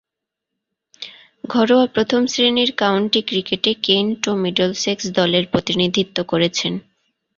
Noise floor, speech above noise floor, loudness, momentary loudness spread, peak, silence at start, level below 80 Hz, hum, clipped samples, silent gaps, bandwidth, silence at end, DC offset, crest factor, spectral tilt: -83 dBFS; 65 dB; -18 LUFS; 9 LU; 0 dBFS; 1 s; -56 dBFS; none; under 0.1%; none; 7.4 kHz; 0.6 s; under 0.1%; 18 dB; -4 dB/octave